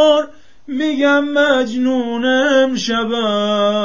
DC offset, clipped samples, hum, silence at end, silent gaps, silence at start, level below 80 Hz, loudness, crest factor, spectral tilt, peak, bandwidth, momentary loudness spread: 1%; under 0.1%; none; 0 s; none; 0 s; -56 dBFS; -15 LUFS; 14 dB; -4 dB/octave; -2 dBFS; 7.4 kHz; 6 LU